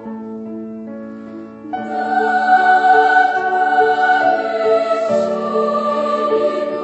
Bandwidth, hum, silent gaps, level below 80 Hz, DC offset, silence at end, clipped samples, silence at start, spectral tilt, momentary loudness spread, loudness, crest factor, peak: 8.4 kHz; none; none; -64 dBFS; under 0.1%; 0 s; under 0.1%; 0 s; -5 dB/octave; 19 LU; -15 LUFS; 16 dB; 0 dBFS